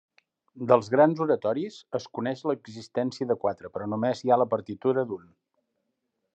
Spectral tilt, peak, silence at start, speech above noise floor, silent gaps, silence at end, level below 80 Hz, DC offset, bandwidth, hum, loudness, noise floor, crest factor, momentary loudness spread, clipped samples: -7 dB/octave; -6 dBFS; 0.55 s; 53 dB; none; 1.2 s; -80 dBFS; under 0.1%; 8.4 kHz; none; -27 LUFS; -79 dBFS; 22 dB; 12 LU; under 0.1%